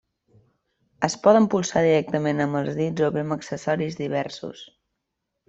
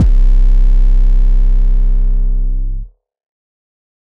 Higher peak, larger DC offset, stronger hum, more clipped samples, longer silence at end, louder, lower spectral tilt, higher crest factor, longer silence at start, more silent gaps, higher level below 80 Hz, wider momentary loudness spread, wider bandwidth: about the same, -4 dBFS vs -2 dBFS; neither; neither; neither; second, 0.85 s vs 1.15 s; second, -23 LUFS vs -16 LUFS; second, -5.5 dB/octave vs -9 dB/octave; first, 20 dB vs 8 dB; first, 1 s vs 0 s; neither; second, -62 dBFS vs -10 dBFS; about the same, 12 LU vs 10 LU; first, 8.2 kHz vs 1.1 kHz